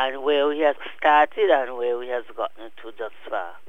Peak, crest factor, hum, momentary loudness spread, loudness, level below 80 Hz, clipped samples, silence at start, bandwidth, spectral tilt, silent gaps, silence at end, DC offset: -6 dBFS; 18 dB; none; 17 LU; -22 LUFS; -76 dBFS; under 0.1%; 0 s; 6.6 kHz; -4.5 dB/octave; none; 0.15 s; 1%